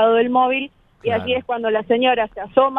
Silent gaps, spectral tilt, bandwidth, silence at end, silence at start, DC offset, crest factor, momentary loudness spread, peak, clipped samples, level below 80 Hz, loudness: none; -7.5 dB/octave; 4 kHz; 0 s; 0 s; under 0.1%; 16 dB; 8 LU; -2 dBFS; under 0.1%; -54 dBFS; -19 LUFS